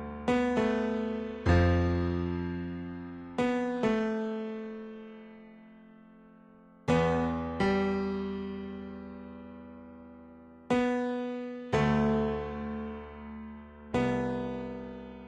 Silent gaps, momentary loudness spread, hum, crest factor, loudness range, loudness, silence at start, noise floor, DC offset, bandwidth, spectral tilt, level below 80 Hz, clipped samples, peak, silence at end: none; 20 LU; none; 18 dB; 6 LU; -31 LUFS; 0 s; -56 dBFS; under 0.1%; 9 kHz; -7.5 dB/octave; -48 dBFS; under 0.1%; -14 dBFS; 0 s